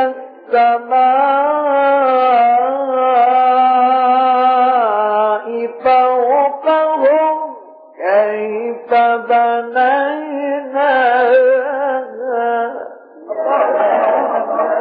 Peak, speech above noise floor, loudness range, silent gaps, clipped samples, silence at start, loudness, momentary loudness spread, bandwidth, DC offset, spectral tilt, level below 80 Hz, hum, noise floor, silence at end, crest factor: -2 dBFS; 23 dB; 4 LU; none; under 0.1%; 0 s; -14 LUFS; 9 LU; 4.9 kHz; under 0.1%; -7 dB/octave; -66 dBFS; none; -35 dBFS; 0 s; 12 dB